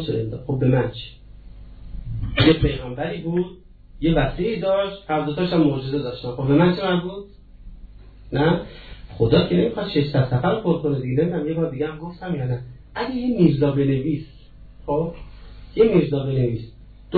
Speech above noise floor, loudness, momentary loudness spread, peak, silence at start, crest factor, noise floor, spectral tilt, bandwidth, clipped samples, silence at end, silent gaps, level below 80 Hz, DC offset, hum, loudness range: 22 dB; -21 LUFS; 16 LU; -4 dBFS; 0 s; 18 dB; -43 dBFS; -10.5 dB/octave; 4.7 kHz; under 0.1%; 0 s; none; -38 dBFS; under 0.1%; none; 2 LU